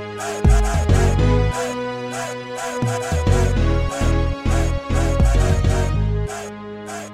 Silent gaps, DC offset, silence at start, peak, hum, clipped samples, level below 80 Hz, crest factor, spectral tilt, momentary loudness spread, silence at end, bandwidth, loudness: none; 0.4%; 0 s; -4 dBFS; none; under 0.1%; -22 dBFS; 14 dB; -6 dB/octave; 10 LU; 0 s; 14 kHz; -20 LUFS